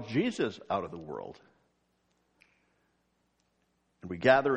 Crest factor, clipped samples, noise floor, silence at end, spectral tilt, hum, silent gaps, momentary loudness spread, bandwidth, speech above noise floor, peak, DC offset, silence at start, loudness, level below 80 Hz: 24 dB; under 0.1%; -75 dBFS; 0 s; -6 dB/octave; none; none; 20 LU; 9.2 kHz; 45 dB; -8 dBFS; under 0.1%; 0 s; -31 LUFS; -70 dBFS